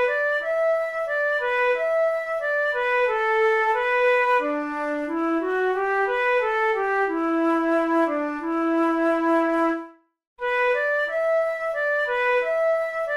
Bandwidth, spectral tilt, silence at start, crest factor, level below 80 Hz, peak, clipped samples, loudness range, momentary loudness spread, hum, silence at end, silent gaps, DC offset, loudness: 12 kHz; -4 dB/octave; 0 s; 12 dB; -60 dBFS; -10 dBFS; under 0.1%; 2 LU; 5 LU; none; 0 s; 10.27-10.36 s; under 0.1%; -22 LUFS